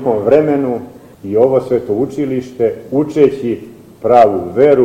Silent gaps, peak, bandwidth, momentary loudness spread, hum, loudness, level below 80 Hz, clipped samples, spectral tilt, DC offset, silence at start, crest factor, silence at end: none; 0 dBFS; 11 kHz; 11 LU; none; -14 LUFS; -48 dBFS; 0.1%; -8 dB/octave; under 0.1%; 0 s; 12 dB; 0 s